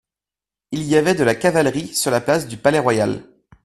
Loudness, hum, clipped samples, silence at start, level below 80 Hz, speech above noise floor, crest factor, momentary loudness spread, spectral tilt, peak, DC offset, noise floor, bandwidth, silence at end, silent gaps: -18 LUFS; none; under 0.1%; 0.7 s; -52 dBFS; 72 dB; 20 dB; 8 LU; -4.5 dB/octave; 0 dBFS; under 0.1%; -89 dBFS; 14 kHz; 0.4 s; none